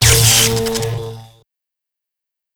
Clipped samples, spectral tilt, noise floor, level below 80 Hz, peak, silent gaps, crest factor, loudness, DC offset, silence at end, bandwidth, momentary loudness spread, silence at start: under 0.1%; -2.5 dB/octave; -83 dBFS; -32 dBFS; 0 dBFS; none; 18 dB; -12 LUFS; under 0.1%; 1.3 s; over 20 kHz; 18 LU; 0 s